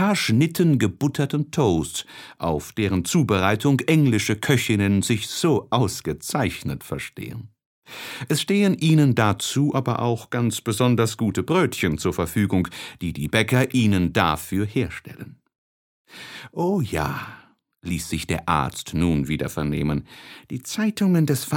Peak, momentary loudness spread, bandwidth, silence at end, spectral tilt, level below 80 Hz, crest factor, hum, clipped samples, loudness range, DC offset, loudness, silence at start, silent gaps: -2 dBFS; 15 LU; 17.5 kHz; 0 s; -5.5 dB/octave; -46 dBFS; 20 dB; none; under 0.1%; 6 LU; under 0.1%; -22 LUFS; 0 s; 7.66-7.82 s, 15.58-16.05 s